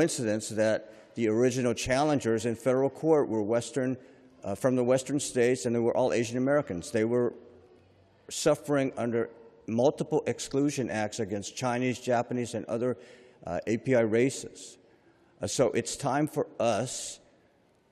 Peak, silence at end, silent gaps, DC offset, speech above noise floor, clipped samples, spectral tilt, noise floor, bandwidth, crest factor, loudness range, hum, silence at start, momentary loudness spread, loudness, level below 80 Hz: -12 dBFS; 0.75 s; none; under 0.1%; 37 dB; under 0.1%; -5 dB/octave; -65 dBFS; 14 kHz; 18 dB; 4 LU; none; 0 s; 11 LU; -29 LUFS; -64 dBFS